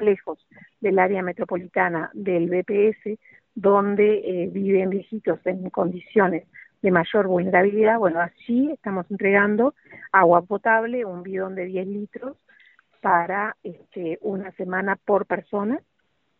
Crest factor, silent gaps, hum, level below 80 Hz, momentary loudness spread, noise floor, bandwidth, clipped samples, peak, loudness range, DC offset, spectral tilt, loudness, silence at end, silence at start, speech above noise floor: 20 dB; none; none; -66 dBFS; 13 LU; -57 dBFS; 4 kHz; under 0.1%; -2 dBFS; 6 LU; under 0.1%; -5.5 dB/octave; -22 LUFS; 0.6 s; 0 s; 35 dB